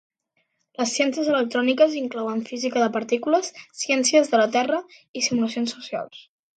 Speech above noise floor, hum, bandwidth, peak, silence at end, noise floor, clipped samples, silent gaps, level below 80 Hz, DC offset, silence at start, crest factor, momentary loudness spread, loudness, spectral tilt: 50 dB; none; 9.2 kHz; -6 dBFS; 0.35 s; -72 dBFS; under 0.1%; 5.08-5.14 s; -74 dBFS; under 0.1%; 0.8 s; 18 dB; 13 LU; -22 LUFS; -2.5 dB/octave